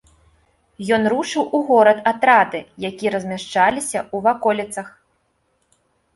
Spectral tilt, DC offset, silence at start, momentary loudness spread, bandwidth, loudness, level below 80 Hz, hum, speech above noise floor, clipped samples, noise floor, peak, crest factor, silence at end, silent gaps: -4 dB/octave; under 0.1%; 0.8 s; 15 LU; 11.5 kHz; -18 LUFS; -60 dBFS; none; 48 dB; under 0.1%; -66 dBFS; -2 dBFS; 18 dB; 1.25 s; none